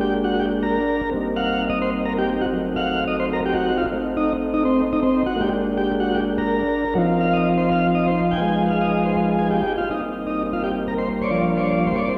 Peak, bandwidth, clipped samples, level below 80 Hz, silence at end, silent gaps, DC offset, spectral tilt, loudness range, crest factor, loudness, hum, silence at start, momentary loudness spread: -8 dBFS; 5.8 kHz; under 0.1%; -38 dBFS; 0 s; none; under 0.1%; -9 dB/octave; 2 LU; 14 dB; -21 LUFS; none; 0 s; 5 LU